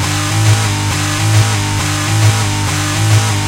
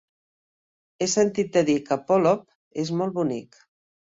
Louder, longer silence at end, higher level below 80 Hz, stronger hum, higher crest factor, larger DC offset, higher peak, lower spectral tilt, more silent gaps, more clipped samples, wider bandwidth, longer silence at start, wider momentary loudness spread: first, -13 LUFS vs -24 LUFS; second, 0 s vs 0.75 s; first, -34 dBFS vs -66 dBFS; neither; second, 12 dB vs 18 dB; neither; first, 0 dBFS vs -8 dBFS; about the same, -4 dB/octave vs -5 dB/octave; second, none vs 2.55-2.71 s; neither; first, 16.5 kHz vs 8 kHz; second, 0 s vs 1 s; second, 3 LU vs 9 LU